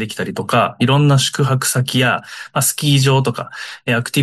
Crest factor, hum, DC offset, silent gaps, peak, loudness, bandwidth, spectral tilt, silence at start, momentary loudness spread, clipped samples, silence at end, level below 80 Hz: 14 dB; none; under 0.1%; none; -2 dBFS; -16 LUFS; 12.5 kHz; -4.5 dB/octave; 0 s; 10 LU; under 0.1%; 0 s; -54 dBFS